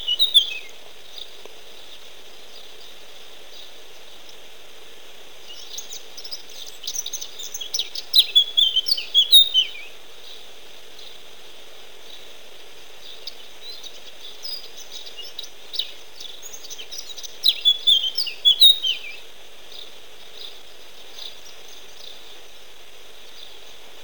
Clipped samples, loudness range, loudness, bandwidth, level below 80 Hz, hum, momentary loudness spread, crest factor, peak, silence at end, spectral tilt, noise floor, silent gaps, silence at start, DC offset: under 0.1%; 24 LU; -17 LUFS; 19.5 kHz; -60 dBFS; none; 27 LU; 22 dB; -4 dBFS; 0.55 s; 2 dB/octave; -46 dBFS; none; 0 s; 2%